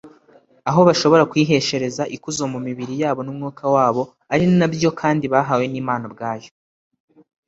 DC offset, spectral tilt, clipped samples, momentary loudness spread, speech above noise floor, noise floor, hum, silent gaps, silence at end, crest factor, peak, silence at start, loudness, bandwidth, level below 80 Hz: under 0.1%; -5.5 dB/octave; under 0.1%; 12 LU; 35 dB; -53 dBFS; none; none; 1 s; 18 dB; -2 dBFS; 0.05 s; -19 LUFS; 8 kHz; -58 dBFS